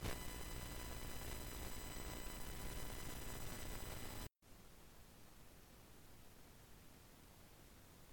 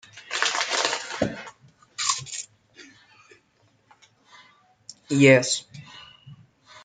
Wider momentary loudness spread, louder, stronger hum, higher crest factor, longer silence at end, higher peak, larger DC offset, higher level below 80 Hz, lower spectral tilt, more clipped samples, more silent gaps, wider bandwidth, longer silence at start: second, 14 LU vs 28 LU; second, -50 LUFS vs -23 LUFS; neither; second, 20 dB vs 26 dB; about the same, 0 s vs 0.05 s; second, -30 dBFS vs -2 dBFS; neither; first, -56 dBFS vs -62 dBFS; about the same, -3.5 dB/octave vs -3.5 dB/octave; neither; neither; first, 19 kHz vs 9.6 kHz; second, 0 s vs 0.15 s